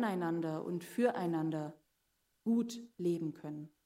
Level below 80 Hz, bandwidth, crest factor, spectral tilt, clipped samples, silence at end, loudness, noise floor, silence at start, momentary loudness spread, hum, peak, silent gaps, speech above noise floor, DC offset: -84 dBFS; 16 kHz; 18 dB; -7 dB/octave; under 0.1%; 0.15 s; -37 LUFS; -80 dBFS; 0 s; 9 LU; none; -18 dBFS; none; 43 dB; under 0.1%